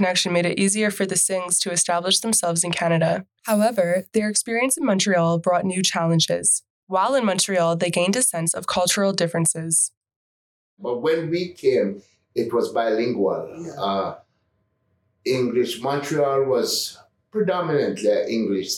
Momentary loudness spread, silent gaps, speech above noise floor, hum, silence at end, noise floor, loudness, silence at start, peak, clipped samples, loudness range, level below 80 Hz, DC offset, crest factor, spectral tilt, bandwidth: 7 LU; 6.70-6.87 s, 9.97-10.01 s, 10.16-10.77 s; 48 dB; none; 0 s; -69 dBFS; -21 LUFS; 0 s; -8 dBFS; under 0.1%; 5 LU; -68 dBFS; under 0.1%; 14 dB; -3.5 dB/octave; 19 kHz